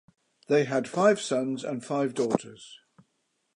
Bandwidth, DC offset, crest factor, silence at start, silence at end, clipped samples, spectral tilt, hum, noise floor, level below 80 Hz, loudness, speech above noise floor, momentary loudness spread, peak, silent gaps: 11 kHz; under 0.1%; 22 dB; 0.5 s; 0.8 s; under 0.1%; -5 dB/octave; none; -76 dBFS; -72 dBFS; -27 LUFS; 49 dB; 17 LU; -6 dBFS; none